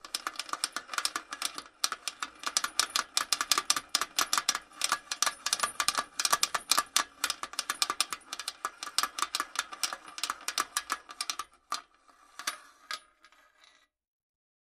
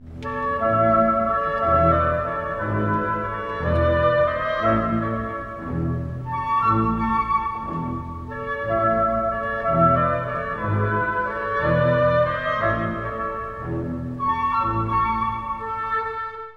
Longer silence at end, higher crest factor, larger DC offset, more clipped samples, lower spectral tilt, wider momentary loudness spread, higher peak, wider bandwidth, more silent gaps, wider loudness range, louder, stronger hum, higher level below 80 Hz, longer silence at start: first, 1.65 s vs 0 s; first, 32 dB vs 18 dB; neither; neither; second, 2 dB/octave vs -9 dB/octave; about the same, 11 LU vs 10 LU; about the same, -2 dBFS vs -4 dBFS; first, 15.5 kHz vs 6.8 kHz; neither; first, 8 LU vs 3 LU; second, -31 LUFS vs -22 LUFS; neither; second, -72 dBFS vs -38 dBFS; about the same, 0.05 s vs 0 s